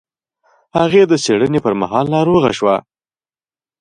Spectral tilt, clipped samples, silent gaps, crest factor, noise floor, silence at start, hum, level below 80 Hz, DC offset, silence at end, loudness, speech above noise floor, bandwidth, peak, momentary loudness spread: -5.5 dB/octave; under 0.1%; none; 16 dB; under -90 dBFS; 0.75 s; none; -50 dBFS; under 0.1%; 1 s; -14 LUFS; over 77 dB; 11 kHz; 0 dBFS; 5 LU